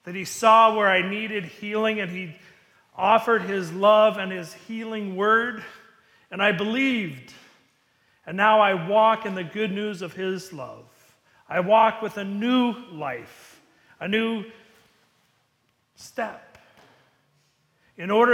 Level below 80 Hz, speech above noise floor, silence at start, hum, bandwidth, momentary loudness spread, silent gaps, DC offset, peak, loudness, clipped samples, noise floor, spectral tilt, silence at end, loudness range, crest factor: -70 dBFS; 47 dB; 0.05 s; none; 16 kHz; 18 LU; none; under 0.1%; -4 dBFS; -22 LUFS; under 0.1%; -69 dBFS; -5 dB/octave; 0 s; 10 LU; 20 dB